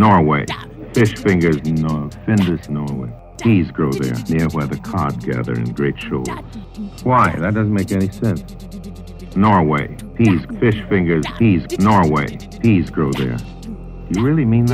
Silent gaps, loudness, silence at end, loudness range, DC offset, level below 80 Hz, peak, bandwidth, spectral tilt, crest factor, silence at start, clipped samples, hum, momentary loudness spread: none; -17 LUFS; 0 s; 4 LU; under 0.1%; -36 dBFS; 0 dBFS; 15 kHz; -7.5 dB/octave; 16 dB; 0 s; under 0.1%; none; 16 LU